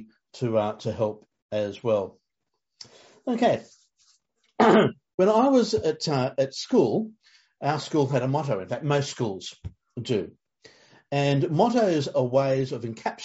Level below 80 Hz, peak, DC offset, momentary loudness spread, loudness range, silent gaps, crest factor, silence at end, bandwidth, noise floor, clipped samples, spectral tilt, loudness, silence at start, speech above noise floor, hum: -62 dBFS; -6 dBFS; under 0.1%; 12 LU; 7 LU; 1.42-1.49 s, 5.14-5.18 s; 20 dB; 0 s; 8 kHz; -82 dBFS; under 0.1%; -5.5 dB/octave; -25 LUFS; 0 s; 58 dB; none